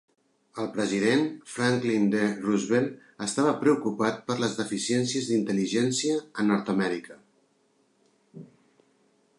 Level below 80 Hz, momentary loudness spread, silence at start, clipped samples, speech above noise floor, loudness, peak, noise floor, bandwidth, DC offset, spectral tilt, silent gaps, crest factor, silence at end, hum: -72 dBFS; 7 LU; 0.55 s; under 0.1%; 42 dB; -27 LUFS; -10 dBFS; -68 dBFS; 11.5 kHz; under 0.1%; -4.5 dB/octave; none; 18 dB; 0.95 s; none